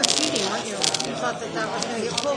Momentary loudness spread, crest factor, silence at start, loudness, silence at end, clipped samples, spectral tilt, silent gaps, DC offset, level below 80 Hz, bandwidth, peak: 7 LU; 24 dB; 0 s; -24 LUFS; 0 s; under 0.1%; -1.5 dB/octave; none; under 0.1%; -62 dBFS; 11 kHz; 0 dBFS